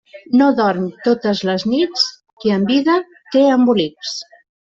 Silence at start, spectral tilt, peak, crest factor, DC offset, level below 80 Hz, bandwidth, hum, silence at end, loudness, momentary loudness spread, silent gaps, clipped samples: 0.15 s; -5.5 dB/octave; -2 dBFS; 14 dB; under 0.1%; -60 dBFS; 7.6 kHz; none; 0.45 s; -16 LUFS; 9 LU; 2.33-2.37 s; under 0.1%